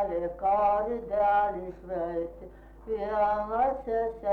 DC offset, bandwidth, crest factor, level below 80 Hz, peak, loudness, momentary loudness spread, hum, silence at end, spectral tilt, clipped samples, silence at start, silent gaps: under 0.1%; 4.7 kHz; 12 dB; -50 dBFS; -16 dBFS; -28 LUFS; 12 LU; none; 0 s; -8 dB/octave; under 0.1%; 0 s; none